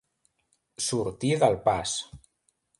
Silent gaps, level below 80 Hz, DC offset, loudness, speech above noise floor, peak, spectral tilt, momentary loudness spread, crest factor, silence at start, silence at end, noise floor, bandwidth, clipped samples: none; -56 dBFS; under 0.1%; -27 LUFS; 47 dB; -8 dBFS; -4 dB/octave; 15 LU; 22 dB; 0.8 s; 0.6 s; -73 dBFS; 11.5 kHz; under 0.1%